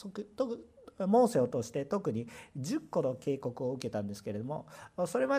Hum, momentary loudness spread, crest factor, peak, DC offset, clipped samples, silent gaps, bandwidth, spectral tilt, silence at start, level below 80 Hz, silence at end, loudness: none; 14 LU; 16 dB; -18 dBFS; under 0.1%; under 0.1%; none; 15.5 kHz; -6.5 dB/octave; 0 s; -72 dBFS; 0 s; -34 LUFS